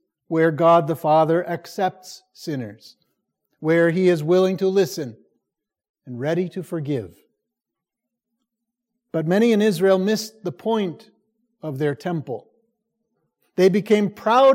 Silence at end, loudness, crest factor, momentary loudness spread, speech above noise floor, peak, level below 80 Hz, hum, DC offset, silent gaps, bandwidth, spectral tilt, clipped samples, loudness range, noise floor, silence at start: 0 s; -21 LUFS; 16 dB; 16 LU; 65 dB; -4 dBFS; -74 dBFS; none; under 0.1%; 5.89-5.94 s; 16.5 kHz; -6.5 dB/octave; under 0.1%; 9 LU; -85 dBFS; 0.3 s